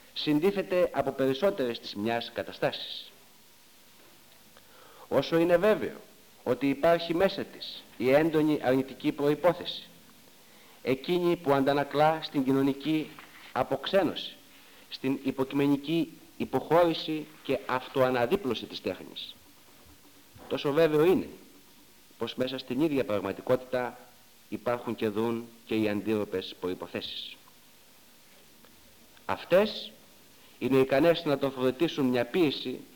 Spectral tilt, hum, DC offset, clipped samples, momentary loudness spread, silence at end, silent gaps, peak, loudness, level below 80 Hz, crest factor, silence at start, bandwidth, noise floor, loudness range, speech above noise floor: -6 dB/octave; none; under 0.1%; under 0.1%; 14 LU; 0.1 s; none; -10 dBFS; -29 LUFS; -62 dBFS; 20 dB; 0.15 s; 19 kHz; -58 dBFS; 6 LU; 30 dB